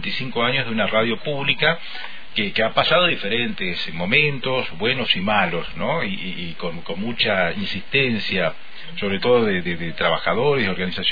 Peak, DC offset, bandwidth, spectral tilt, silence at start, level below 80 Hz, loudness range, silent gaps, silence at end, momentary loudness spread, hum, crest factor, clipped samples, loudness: -4 dBFS; 4%; 5 kHz; -7 dB/octave; 0 s; -50 dBFS; 3 LU; none; 0 s; 11 LU; none; 18 dB; under 0.1%; -21 LUFS